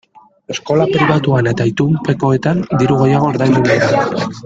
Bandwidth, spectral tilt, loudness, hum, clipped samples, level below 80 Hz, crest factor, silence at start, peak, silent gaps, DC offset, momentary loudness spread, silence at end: 7.8 kHz; -7 dB/octave; -14 LUFS; none; under 0.1%; -46 dBFS; 14 dB; 0.5 s; 0 dBFS; none; under 0.1%; 4 LU; 0 s